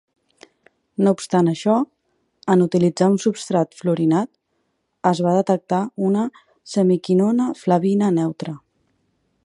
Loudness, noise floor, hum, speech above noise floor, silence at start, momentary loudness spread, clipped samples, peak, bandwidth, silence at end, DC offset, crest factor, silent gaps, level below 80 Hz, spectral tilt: -19 LUFS; -71 dBFS; none; 52 dB; 1 s; 11 LU; under 0.1%; -2 dBFS; 11.5 kHz; 0.9 s; under 0.1%; 18 dB; none; -68 dBFS; -7 dB/octave